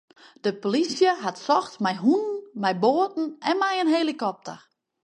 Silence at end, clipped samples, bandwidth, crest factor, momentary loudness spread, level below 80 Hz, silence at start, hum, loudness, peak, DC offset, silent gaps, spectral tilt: 0.5 s; under 0.1%; 10.5 kHz; 18 dB; 8 LU; -78 dBFS; 0.45 s; none; -24 LUFS; -8 dBFS; under 0.1%; none; -5 dB/octave